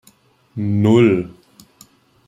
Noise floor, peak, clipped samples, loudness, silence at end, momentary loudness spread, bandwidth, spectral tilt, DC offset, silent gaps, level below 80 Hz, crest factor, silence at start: -54 dBFS; -2 dBFS; under 0.1%; -16 LUFS; 1 s; 21 LU; 11.5 kHz; -8 dB/octave; under 0.1%; none; -56 dBFS; 18 dB; 0.55 s